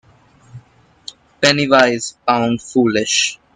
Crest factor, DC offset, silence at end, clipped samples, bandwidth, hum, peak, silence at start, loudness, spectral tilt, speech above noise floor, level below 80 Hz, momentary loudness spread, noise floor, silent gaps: 18 dB; under 0.1%; 0.2 s; under 0.1%; 10 kHz; none; 0 dBFS; 0.55 s; -15 LUFS; -3 dB/octave; 34 dB; -56 dBFS; 23 LU; -49 dBFS; none